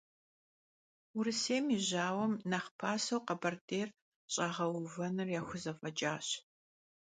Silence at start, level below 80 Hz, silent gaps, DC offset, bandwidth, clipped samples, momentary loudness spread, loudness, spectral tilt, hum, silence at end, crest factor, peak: 1.15 s; -78 dBFS; 2.71-2.79 s, 3.61-3.68 s, 4.02-4.28 s; under 0.1%; 9.4 kHz; under 0.1%; 7 LU; -37 LUFS; -4 dB/octave; none; 0.65 s; 20 dB; -18 dBFS